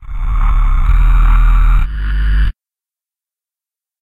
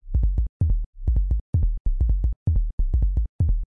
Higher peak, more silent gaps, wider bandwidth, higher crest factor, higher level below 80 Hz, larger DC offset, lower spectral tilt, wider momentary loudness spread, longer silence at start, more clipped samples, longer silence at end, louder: first, 0 dBFS vs -12 dBFS; second, none vs 0.49-0.60 s, 0.86-0.93 s, 1.41-1.53 s, 1.80-1.85 s, 2.36-2.46 s, 2.73-2.78 s, 3.29-3.39 s; first, 4 kHz vs 1 kHz; about the same, 10 dB vs 10 dB; first, -12 dBFS vs -22 dBFS; neither; second, -7 dB/octave vs -12.5 dB/octave; first, 6 LU vs 2 LU; about the same, 0 s vs 0.05 s; neither; first, 1.5 s vs 0.1 s; first, -15 LUFS vs -26 LUFS